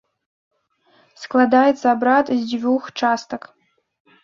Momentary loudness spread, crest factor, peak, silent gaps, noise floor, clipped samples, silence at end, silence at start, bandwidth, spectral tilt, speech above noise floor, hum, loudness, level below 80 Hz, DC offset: 15 LU; 18 dB; -2 dBFS; none; -59 dBFS; under 0.1%; 0.85 s; 1.2 s; 7.4 kHz; -4.5 dB/octave; 42 dB; none; -18 LUFS; -66 dBFS; under 0.1%